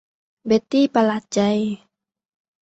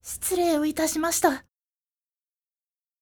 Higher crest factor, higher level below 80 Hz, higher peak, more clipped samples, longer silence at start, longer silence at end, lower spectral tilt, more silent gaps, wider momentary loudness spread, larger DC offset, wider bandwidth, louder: about the same, 18 dB vs 20 dB; about the same, -60 dBFS vs -58 dBFS; about the same, -4 dBFS vs -6 dBFS; neither; first, 0.45 s vs 0.05 s; second, 0.85 s vs 1.6 s; first, -5.5 dB/octave vs -2 dB/octave; neither; first, 13 LU vs 4 LU; neither; second, 8.2 kHz vs over 20 kHz; first, -20 LUFS vs -24 LUFS